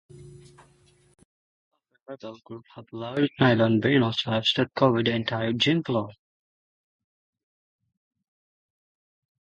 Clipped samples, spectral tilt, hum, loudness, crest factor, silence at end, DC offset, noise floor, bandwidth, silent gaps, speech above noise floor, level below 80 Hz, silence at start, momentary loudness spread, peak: under 0.1%; -6.5 dB/octave; none; -23 LUFS; 24 dB; 3.35 s; under 0.1%; -60 dBFS; 10.5 kHz; 1.25-1.71 s, 2.02-2.06 s; 36 dB; -64 dBFS; 0.15 s; 21 LU; -4 dBFS